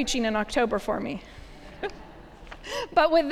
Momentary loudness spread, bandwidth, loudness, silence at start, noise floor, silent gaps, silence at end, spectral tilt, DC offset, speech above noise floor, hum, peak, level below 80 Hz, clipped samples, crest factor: 24 LU; 15 kHz; -27 LUFS; 0 s; -45 dBFS; none; 0 s; -3.5 dB/octave; under 0.1%; 20 dB; none; -8 dBFS; -46 dBFS; under 0.1%; 20 dB